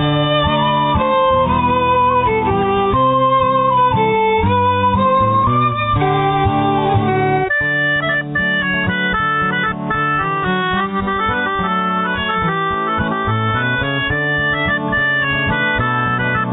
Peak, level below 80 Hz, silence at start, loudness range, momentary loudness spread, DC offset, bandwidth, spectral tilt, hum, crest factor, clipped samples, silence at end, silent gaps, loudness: -4 dBFS; -36 dBFS; 0 s; 3 LU; 4 LU; under 0.1%; 4 kHz; -9.5 dB/octave; none; 12 dB; under 0.1%; 0 s; none; -15 LUFS